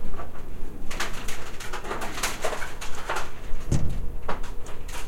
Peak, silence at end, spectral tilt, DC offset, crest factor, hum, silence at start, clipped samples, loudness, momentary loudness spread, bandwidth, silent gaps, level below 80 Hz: -10 dBFS; 0 s; -4 dB/octave; under 0.1%; 12 dB; none; 0 s; under 0.1%; -33 LUFS; 12 LU; 15 kHz; none; -32 dBFS